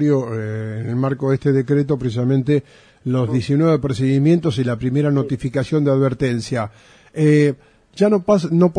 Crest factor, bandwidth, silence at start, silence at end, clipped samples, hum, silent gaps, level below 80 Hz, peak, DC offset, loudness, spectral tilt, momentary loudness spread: 14 dB; 10 kHz; 0 s; 0.05 s; under 0.1%; none; none; -48 dBFS; -2 dBFS; under 0.1%; -18 LUFS; -8 dB/octave; 10 LU